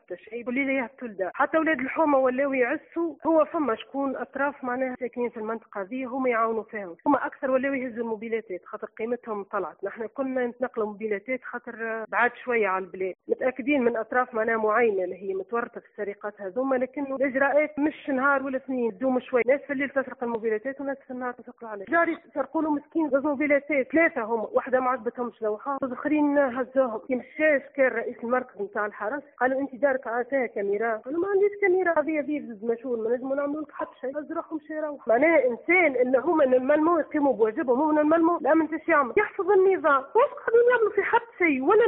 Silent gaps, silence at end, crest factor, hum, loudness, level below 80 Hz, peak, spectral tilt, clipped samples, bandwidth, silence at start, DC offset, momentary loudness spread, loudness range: none; 0 s; 16 dB; none; -26 LUFS; -70 dBFS; -8 dBFS; -3.5 dB/octave; under 0.1%; 3.9 kHz; 0.1 s; under 0.1%; 11 LU; 7 LU